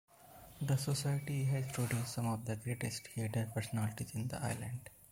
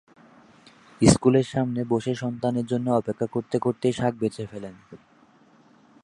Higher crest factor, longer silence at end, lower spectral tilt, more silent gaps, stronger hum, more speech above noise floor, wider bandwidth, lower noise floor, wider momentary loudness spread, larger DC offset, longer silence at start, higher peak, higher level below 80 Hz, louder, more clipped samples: second, 16 dB vs 24 dB; second, 0.05 s vs 1.1 s; about the same, -5.5 dB/octave vs -6 dB/octave; neither; neither; second, 20 dB vs 33 dB; first, 16.5 kHz vs 11.5 kHz; about the same, -58 dBFS vs -57 dBFS; second, 7 LU vs 10 LU; neither; second, 0.2 s vs 1 s; second, -24 dBFS vs -2 dBFS; second, -64 dBFS vs -50 dBFS; second, -38 LUFS vs -24 LUFS; neither